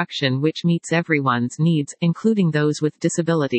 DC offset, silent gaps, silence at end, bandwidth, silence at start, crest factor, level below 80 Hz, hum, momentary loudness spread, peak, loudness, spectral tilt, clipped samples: under 0.1%; none; 0 s; 8.8 kHz; 0 s; 18 dB; -70 dBFS; none; 3 LU; -2 dBFS; -20 LUFS; -6 dB/octave; under 0.1%